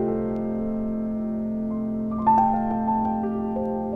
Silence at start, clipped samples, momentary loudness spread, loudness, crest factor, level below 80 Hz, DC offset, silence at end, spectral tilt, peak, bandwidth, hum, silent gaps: 0 s; under 0.1%; 8 LU; -25 LUFS; 16 dB; -46 dBFS; under 0.1%; 0 s; -10.5 dB/octave; -8 dBFS; 3 kHz; none; none